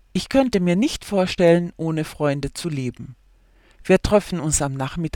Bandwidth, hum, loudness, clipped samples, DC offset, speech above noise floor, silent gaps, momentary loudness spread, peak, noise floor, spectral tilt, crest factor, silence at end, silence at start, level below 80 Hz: 17.5 kHz; none; -21 LUFS; under 0.1%; under 0.1%; 34 dB; none; 11 LU; -2 dBFS; -54 dBFS; -5.5 dB/octave; 18 dB; 0.05 s; 0.15 s; -40 dBFS